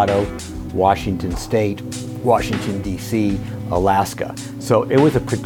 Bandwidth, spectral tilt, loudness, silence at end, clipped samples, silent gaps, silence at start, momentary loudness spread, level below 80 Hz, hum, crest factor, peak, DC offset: 18.5 kHz; -6 dB/octave; -19 LUFS; 0 s; under 0.1%; none; 0 s; 11 LU; -36 dBFS; none; 18 dB; -2 dBFS; under 0.1%